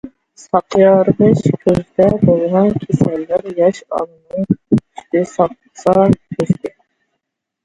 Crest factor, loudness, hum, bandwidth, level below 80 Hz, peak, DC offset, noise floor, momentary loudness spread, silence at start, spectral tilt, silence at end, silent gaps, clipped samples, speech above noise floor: 14 dB; -15 LUFS; none; 10.5 kHz; -44 dBFS; 0 dBFS; under 0.1%; -75 dBFS; 9 LU; 0.05 s; -8.5 dB/octave; 0.95 s; none; under 0.1%; 62 dB